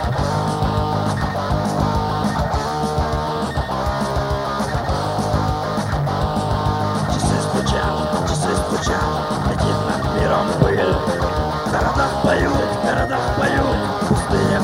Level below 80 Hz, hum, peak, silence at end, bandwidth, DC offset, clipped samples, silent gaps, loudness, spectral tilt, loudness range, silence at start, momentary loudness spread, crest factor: -30 dBFS; none; -2 dBFS; 0 s; 16.5 kHz; under 0.1%; under 0.1%; none; -20 LUFS; -6 dB/octave; 3 LU; 0 s; 4 LU; 16 dB